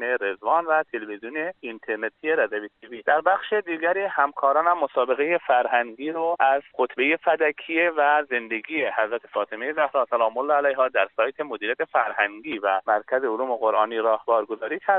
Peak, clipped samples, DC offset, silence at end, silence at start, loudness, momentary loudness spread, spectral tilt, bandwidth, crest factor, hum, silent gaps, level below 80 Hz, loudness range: -6 dBFS; under 0.1%; under 0.1%; 0 s; 0 s; -23 LUFS; 8 LU; -0.5 dB/octave; 4.1 kHz; 18 dB; none; none; -76 dBFS; 3 LU